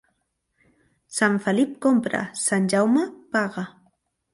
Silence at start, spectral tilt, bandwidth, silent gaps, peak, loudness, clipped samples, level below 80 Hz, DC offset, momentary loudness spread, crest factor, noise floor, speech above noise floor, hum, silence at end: 1.1 s; -4.5 dB/octave; 11.5 kHz; none; -8 dBFS; -22 LUFS; under 0.1%; -68 dBFS; under 0.1%; 10 LU; 16 dB; -74 dBFS; 52 dB; none; 0.65 s